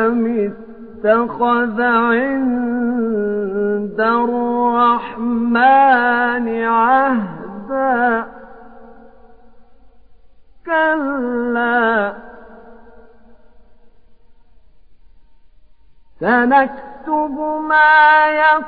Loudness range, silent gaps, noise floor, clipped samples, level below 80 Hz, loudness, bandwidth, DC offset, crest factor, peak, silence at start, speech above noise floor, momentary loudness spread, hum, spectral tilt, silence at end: 9 LU; none; -50 dBFS; under 0.1%; -52 dBFS; -15 LUFS; 4.9 kHz; 0.6%; 16 dB; -2 dBFS; 0 s; 35 dB; 11 LU; none; -9.5 dB/octave; 0 s